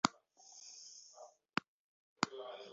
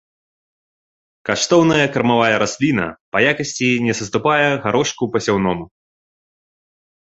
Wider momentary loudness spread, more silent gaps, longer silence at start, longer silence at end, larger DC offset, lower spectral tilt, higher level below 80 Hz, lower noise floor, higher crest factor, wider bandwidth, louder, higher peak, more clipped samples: first, 18 LU vs 7 LU; first, 1.68-2.16 s vs 3.01-3.12 s; second, 0.05 s vs 1.25 s; second, 0 s vs 1.45 s; neither; second, -2 dB/octave vs -4.5 dB/octave; second, -82 dBFS vs -52 dBFS; second, -62 dBFS vs under -90 dBFS; first, 36 dB vs 18 dB; about the same, 7.6 kHz vs 8.2 kHz; second, -43 LUFS vs -17 LUFS; second, -8 dBFS vs -2 dBFS; neither